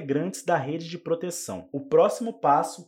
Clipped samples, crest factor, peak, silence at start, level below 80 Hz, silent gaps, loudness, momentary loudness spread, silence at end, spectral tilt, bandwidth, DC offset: under 0.1%; 18 dB; -8 dBFS; 0 s; -74 dBFS; none; -26 LUFS; 12 LU; 0.05 s; -5 dB/octave; 16.5 kHz; under 0.1%